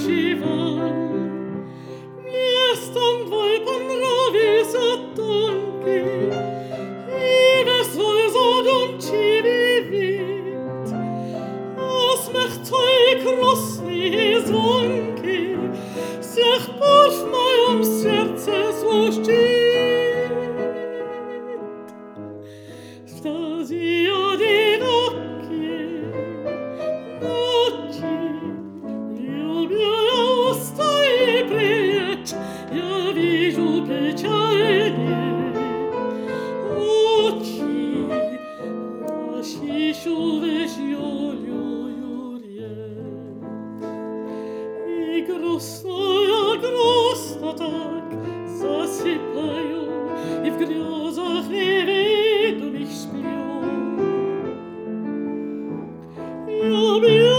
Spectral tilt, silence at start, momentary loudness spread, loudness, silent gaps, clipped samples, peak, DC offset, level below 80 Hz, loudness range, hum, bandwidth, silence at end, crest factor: -4.5 dB/octave; 0 s; 14 LU; -21 LUFS; none; under 0.1%; 0 dBFS; under 0.1%; -66 dBFS; 8 LU; none; over 20 kHz; 0 s; 20 dB